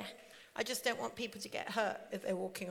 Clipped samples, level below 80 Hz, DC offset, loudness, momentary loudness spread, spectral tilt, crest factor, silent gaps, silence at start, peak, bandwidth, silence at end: under 0.1%; -80 dBFS; under 0.1%; -39 LUFS; 11 LU; -3 dB/octave; 22 dB; none; 0 s; -18 dBFS; 18.5 kHz; 0 s